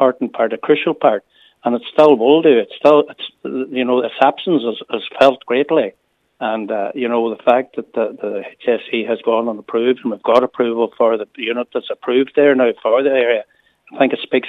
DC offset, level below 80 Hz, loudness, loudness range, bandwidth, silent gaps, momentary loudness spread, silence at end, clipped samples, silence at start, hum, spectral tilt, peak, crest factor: under 0.1%; -68 dBFS; -16 LUFS; 4 LU; 7 kHz; none; 11 LU; 0 s; under 0.1%; 0 s; none; -6.5 dB/octave; 0 dBFS; 16 dB